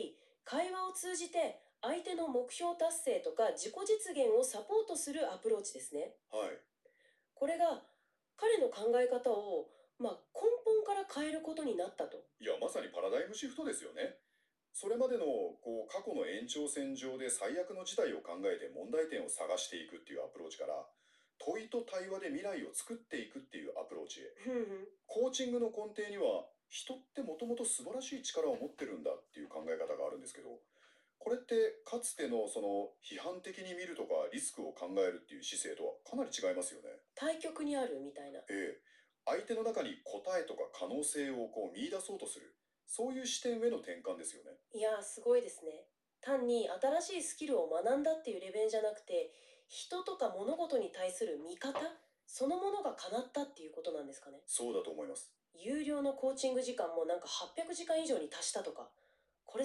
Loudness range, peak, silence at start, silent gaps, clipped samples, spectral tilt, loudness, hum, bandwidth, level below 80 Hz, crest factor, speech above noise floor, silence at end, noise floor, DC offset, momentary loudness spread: 5 LU; -22 dBFS; 0 s; none; under 0.1%; -2 dB/octave; -39 LUFS; none; 13.5 kHz; -84 dBFS; 18 dB; 42 dB; 0 s; -81 dBFS; under 0.1%; 12 LU